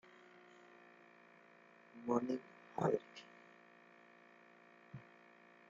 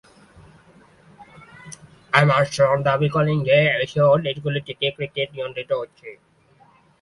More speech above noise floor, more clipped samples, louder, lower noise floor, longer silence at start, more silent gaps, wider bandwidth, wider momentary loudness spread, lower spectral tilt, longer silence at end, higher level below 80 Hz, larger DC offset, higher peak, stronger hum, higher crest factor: second, 25 dB vs 35 dB; neither; second, -41 LUFS vs -20 LUFS; first, -65 dBFS vs -55 dBFS; first, 1.95 s vs 1.2 s; neither; second, 7.4 kHz vs 11.5 kHz; first, 25 LU vs 21 LU; about the same, -6.5 dB/octave vs -6 dB/octave; second, 0.7 s vs 0.85 s; second, -84 dBFS vs -56 dBFS; neither; second, -22 dBFS vs 0 dBFS; neither; about the same, 24 dB vs 22 dB